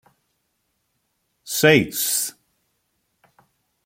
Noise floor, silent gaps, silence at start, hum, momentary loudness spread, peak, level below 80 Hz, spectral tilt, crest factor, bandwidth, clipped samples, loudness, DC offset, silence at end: -72 dBFS; none; 1.45 s; none; 12 LU; -2 dBFS; -62 dBFS; -3.5 dB/octave; 24 dB; 16.5 kHz; under 0.1%; -19 LUFS; under 0.1%; 1.55 s